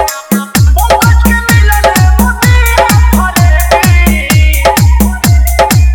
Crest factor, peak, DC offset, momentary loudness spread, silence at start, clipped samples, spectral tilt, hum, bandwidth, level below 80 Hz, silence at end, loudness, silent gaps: 6 dB; 0 dBFS; under 0.1%; 2 LU; 0 s; 2%; -5 dB/octave; none; over 20 kHz; -10 dBFS; 0 s; -7 LUFS; none